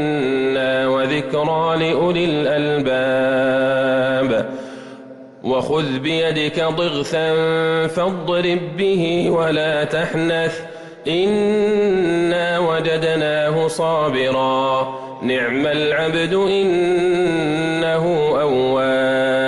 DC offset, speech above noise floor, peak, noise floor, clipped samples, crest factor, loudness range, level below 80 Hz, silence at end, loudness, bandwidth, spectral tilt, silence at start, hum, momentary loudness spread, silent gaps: under 0.1%; 21 dB; -10 dBFS; -38 dBFS; under 0.1%; 8 dB; 2 LU; -52 dBFS; 0 s; -18 LUFS; 12 kHz; -6 dB/octave; 0 s; none; 4 LU; none